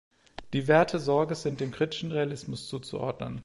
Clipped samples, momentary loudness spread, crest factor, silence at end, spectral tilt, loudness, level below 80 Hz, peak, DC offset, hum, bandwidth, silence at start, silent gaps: under 0.1%; 14 LU; 20 dB; 0 s; -6 dB/octave; -29 LUFS; -60 dBFS; -8 dBFS; under 0.1%; none; 11.5 kHz; 0.4 s; none